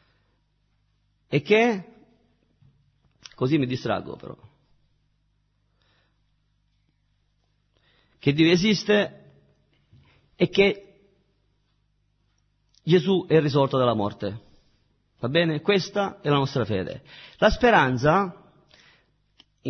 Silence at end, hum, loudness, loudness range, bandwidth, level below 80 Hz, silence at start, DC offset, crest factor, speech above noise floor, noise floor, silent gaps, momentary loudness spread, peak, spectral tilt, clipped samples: 0 s; 50 Hz at -55 dBFS; -23 LUFS; 8 LU; 6.6 kHz; -50 dBFS; 1.3 s; under 0.1%; 22 dB; 47 dB; -69 dBFS; none; 15 LU; -4 dBFS; -6 dB/octave; under 0.1%